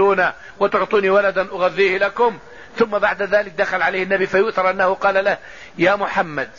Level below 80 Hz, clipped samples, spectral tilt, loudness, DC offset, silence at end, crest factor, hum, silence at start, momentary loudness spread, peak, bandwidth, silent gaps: -54 dBFS; under 0.1%; -5.5 dB/octave; -18 LUFS; 0.5%; 0.1 s; 14 dB; none; 0 s; 6 LU; -4 dBFS; 7.4 kHz; none